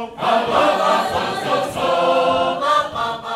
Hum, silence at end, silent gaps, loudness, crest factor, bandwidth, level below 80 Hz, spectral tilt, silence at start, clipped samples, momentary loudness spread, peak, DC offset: none; 0 s; none; -18 LUFS; 14 dB; 15.5 kHz; -52 dBFS; -4 dB/octave; 0 s; under 0.1%; 5 LU; -4 dBFS; under 0.1%